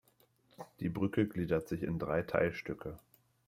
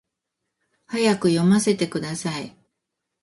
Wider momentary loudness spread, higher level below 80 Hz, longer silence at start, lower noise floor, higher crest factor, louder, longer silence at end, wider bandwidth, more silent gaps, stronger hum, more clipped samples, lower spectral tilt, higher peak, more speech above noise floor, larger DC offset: first, 17 LU vs 13 LU; about the same, -62 dBFS vs -62 dBFS; second, 0.6 s vs 0.9 s; second, -70 dBFS vs -81 dBFS; about the same, 20 dB vs 16 dB; second, -36 LUFS vs -22 LUFS; second, 0.5 s vs 0.75 s; first, 16 kHz vs 11.5 kHz; neither; neither; neither; first, -8 dB/octave vs -5.5 dB/octave; second, -16 dBFS vs -6 dBFS; second, 36 dB vs 60 dB; neither